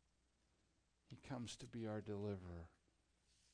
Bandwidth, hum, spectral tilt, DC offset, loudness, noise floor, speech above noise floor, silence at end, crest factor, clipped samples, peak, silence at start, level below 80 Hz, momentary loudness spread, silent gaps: 9.6 kHz; none; -6 dB/octave; under 0.1%; -50 LUFS; -82 dBFS; 32 dB; 0.85 s; 16 dB; under 0.1%; -36 dBFS; 1.1 s; -72 dBFS; 15 LU; none